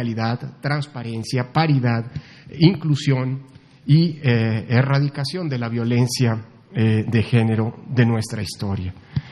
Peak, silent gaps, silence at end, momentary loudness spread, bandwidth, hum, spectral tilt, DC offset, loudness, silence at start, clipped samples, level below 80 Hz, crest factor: 0 dBFS; none; 0 s; 11 LU; 12 kHz; none; -6.5 dB/octave; under 0.1%; -21 LUFS; 0 s; under 0.1%; -52 dBFS; 20 dB